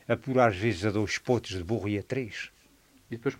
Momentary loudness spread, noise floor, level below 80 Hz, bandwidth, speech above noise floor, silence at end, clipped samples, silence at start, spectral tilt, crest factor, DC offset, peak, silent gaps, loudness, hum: 14 LU; -61 dBFS; -58 dBFS; 16 kHz; 32 dB; 0.05 s; under 0.1%; 0.1 s; -6 dB/octave; 22 dB; under 0.1%; -8 dBFS; none; -29 LUFS; none